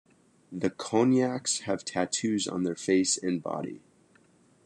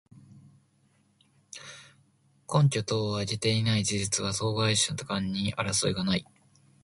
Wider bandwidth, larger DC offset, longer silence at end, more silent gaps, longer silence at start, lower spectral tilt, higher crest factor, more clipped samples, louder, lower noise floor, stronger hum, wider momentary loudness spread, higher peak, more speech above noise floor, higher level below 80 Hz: about the same, 11 kHz vs 11.5 kHz; neither; first, 0.9 s vs 0.6 s; neither; first, 0.5 s vs 0.35 s; about the same, -4 dB/octave vs -4 dB/octave; about the same, 20 dB vs 20 dB; neither; about the same, -28 LUFS vs -27 LUFS; second, -62 dBFS vs -67 dBFS; neither; second, 11 LU vs 19 LU; about the same, -10 dBFS vs -10 dBFS; second, 34 dB vs 39 dB; second, -74 dBFS vs -56 dBFS